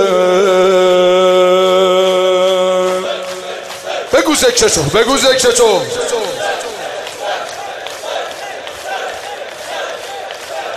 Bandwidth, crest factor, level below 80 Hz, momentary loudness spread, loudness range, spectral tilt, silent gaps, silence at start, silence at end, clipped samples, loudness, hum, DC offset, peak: 14 kHz; 12 dB; -46 dBFS; 15 LU; 11 LU; -3 dB/octave; none; 0 s; 0 s; under 0.1%; -13 LUFS; none; under 0.1%; 0 dBFS